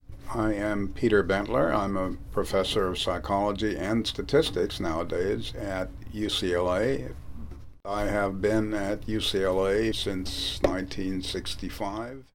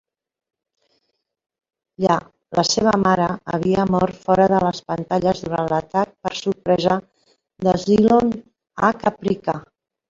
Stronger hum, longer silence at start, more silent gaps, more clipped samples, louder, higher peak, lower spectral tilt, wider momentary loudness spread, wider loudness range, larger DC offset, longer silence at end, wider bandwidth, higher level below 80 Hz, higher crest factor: neither; second, 0.1 s vs 2 s; neither; neither; second, -28 LUFS vs -20 LUFS; second, -6 dBFS vs -2 dBFS; about the same, -5 dB/octave vs -5.5 dB/octave; about the same, 9 LU vs 9 LU; about the same, 3 LU vs 3 LU; neither; second, 0.1 s vs 0.45 s; first, 17 kHz vs 7.8 kHz; first, -42 dBFS vs -50 dBFS; about the same, 20 dB vs 18 dB